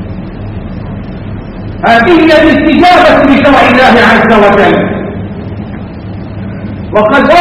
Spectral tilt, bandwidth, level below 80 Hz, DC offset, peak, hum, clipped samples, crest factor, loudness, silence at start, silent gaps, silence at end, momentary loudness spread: -6.5 dB/octave; 13 kHz; -28 dBFS; under 0.1%; 0 dBFS; none; 4%; 6 dB; -5 LUFS; 0 s; none; 0 s; 18 LU